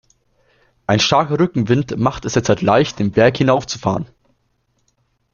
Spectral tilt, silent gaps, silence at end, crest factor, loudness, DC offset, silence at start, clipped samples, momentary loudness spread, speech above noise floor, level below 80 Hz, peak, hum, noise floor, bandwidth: -5.5 dB/octave; none; 1.3 s; 16 dB; -16 LUFS; under 0.1%; 0.9 s; under 0.1%; 7 LU; 49 dB; -48 dBFS; -2 dBFS; none; -65 dBFS; 7.4 kHz